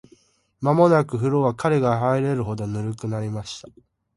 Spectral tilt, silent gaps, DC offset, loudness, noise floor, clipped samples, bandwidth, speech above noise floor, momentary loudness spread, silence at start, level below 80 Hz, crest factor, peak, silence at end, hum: -7.5 dB/octave; none; under 0.1%; -22 LUFS; -58 dBFS; under 0.1%; 11.5 kHz; 36 dB; 12 LU; 0.6 s; -54 dBFS; 18 dB; -4 dBFS; 0.45 s; none